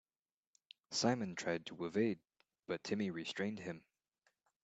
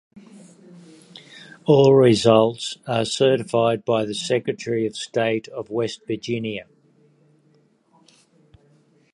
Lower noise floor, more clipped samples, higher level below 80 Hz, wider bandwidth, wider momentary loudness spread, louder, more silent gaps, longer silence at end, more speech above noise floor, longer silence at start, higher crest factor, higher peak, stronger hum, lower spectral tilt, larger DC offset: first, under -90 dBFS vs -60 dBFS; neither; second, -82 dBFS vs -62 dBFS; second, 8.6 kHz vs 11 kHz; about the same, 13 LU vs 15 LU; second, -40 LUFS vs -20 LUFS; neither; second, 0.85 s vs 2.5 s; first, over 51 dB vs 40 dB; first, 0.9 s vs 0.75 s; about the same, 22 dB vs 20 dB; second, -20 dBFS vs -2 dBFS; neither; about the same, -4.5 dB/octave vs -5.5 dB/octave; neither